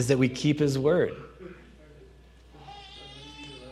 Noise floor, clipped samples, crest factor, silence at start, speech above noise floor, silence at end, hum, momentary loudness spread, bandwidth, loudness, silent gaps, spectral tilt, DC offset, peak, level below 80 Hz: -53 dBFS; under 0.1%; 20 dB; 0 s; 28 dB; 0 s; none; 22 LU; 13.5 kHz; -25 LUFS; none; -6 dB/octave; under 0.1%; -10 dBFS; -54 dBFS